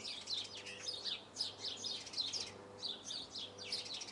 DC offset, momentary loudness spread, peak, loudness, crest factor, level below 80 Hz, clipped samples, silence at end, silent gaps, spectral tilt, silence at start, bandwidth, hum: under 0.1%; 6 LU; -26 dBFS; -42 LUFS; 18 dB; -80 dBFS; under 0.1%; 0 s; none; -0.5 dB/octave; 0 s; 11.5 kHz; none